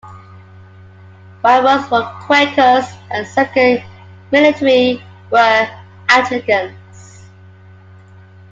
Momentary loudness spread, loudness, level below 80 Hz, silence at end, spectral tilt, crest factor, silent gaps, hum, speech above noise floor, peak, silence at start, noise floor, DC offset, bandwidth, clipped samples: 11 LU; -13 LUFS; -58 dBFS; 1.75 s; -4.5 dB/octave; 16 dB; none; none; 28 dB; 0 dBFS; 0.05 s; -40 dBFS; under 0.1%; 7.8 kHz; under 0.1%